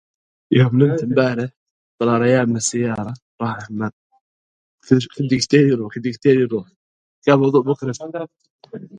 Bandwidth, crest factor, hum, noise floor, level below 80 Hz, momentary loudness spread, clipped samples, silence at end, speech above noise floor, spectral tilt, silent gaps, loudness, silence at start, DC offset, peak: 10.5 kHz; 18 dB; none; under -90 dBFS; -58 dBFS; 14 LU; under 0.1%; 0 s; over 72 dB; -6 dB/octave; 1.57-1.98 s, 3.22-3.38 s, 3.93-4.10 s, 4.21-4.78 s, 6.76-7.22 s, 8.50-8.59 s; -18 LUFS; 0.5 s; under 0.1%; 0 dBFS